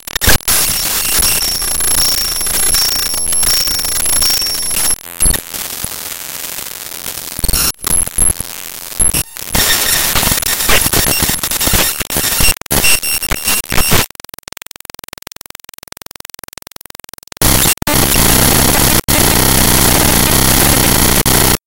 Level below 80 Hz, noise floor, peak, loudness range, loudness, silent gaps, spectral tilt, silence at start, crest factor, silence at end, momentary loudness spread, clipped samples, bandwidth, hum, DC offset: -24 dBFS; -36 dBFS; 0 dBFS; 8 LU; -11 LUFS; none; -2 dB/octave; 0 s; 14 dB; 0 s; 14 LU; 0.2%; over 20 kHz; none; 2%